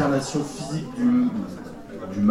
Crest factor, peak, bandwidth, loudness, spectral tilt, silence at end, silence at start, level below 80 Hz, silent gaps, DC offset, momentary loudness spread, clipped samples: 16 dB; -8 dBFS; 12.5 kHz; -25 LUFS; -6 dB/octave; 0 s; 0 s; -52 dBFS; none; under 0.1%; 16 LU; under 0.1%